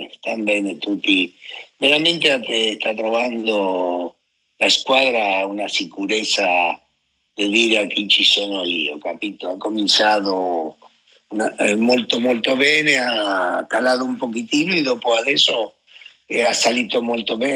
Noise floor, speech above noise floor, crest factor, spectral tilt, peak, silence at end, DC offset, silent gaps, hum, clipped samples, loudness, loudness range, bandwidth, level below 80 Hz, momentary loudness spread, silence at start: -68 dBFS; 49 dB; 18 dB; -2.5 dB/octave; -2 dBFS; 0 s; under 0.1%; none; none; under 0.1%; -18 LUFS; 2 LU; 15.5 kHz; -70 dBFS; 11 LU; 0 s